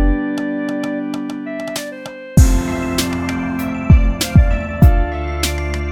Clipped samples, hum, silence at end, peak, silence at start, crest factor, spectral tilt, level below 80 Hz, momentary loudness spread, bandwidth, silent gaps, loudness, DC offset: under 0.1%; none; 0 s; 0 dBFS; 0 s; 16 dB; -6 dB/octave; -18 dBFS; 11 LU; 18.5 kHz; none; -17 LUFS; under 0.1%